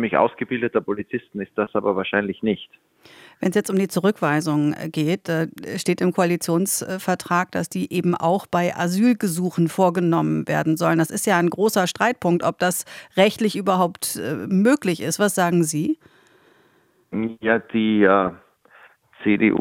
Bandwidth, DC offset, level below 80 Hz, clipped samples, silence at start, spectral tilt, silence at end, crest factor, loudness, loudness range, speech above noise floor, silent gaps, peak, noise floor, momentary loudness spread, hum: 17 kHz; under 0.1%; -64 dBFS; under 0.1%; 0 s; -5 dB/octave; 0 s; 20 dB; -21 LUFS; 3 LU; 39 dB; none; -2 dBFS; -60 dBFS; 8 LU; none